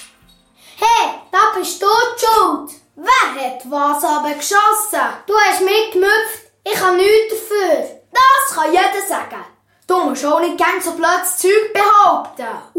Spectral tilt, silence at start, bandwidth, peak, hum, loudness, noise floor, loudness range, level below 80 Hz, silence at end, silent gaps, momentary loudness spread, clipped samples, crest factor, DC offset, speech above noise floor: -1 dB/octave; 0 s; 16.5 kHz; 0 dBFS; none; -14 LUFS; -51 dBFS; 2 LU; -56 dBFS; 0 s; none; 11 LU; under 0.1%; 14 dB; under 0.1%; 36 dB